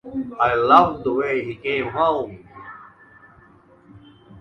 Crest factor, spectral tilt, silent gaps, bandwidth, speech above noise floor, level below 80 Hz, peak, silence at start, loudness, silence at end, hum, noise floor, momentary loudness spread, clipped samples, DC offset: 22 dB; -7 dB/octave; none; 7.2 kHz; 32 dB; -52 dBFS; 0 dBFS; 0.05 s; -19 LUFS; 0 s; none; -51 dBFS; 25 LU; under 0.1%; under 0.1%